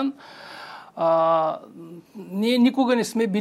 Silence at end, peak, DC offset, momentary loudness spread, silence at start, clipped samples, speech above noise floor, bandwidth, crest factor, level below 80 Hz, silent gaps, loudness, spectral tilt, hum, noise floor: 0 s; -8 dBFS; under 0.1%; 22 LU; 0 s; under 0.1%; 18 dB; 14 kHz; 14 dB; -78 dBFS; none; -22 LUFS; -5.5 dB/octave; none; -41 dBFS